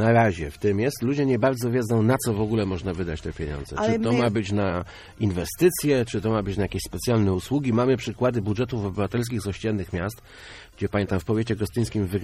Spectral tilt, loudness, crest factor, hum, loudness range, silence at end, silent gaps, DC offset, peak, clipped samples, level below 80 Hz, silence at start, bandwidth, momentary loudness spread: -6.5 dB/octave; -25 LUFS; 16 dB; none; 4 LU; 0 s; none; under 0.1%; -8 dBFS; under 0.1%; -44 dBFS; 0 s; 15.5 kHz; 9 LU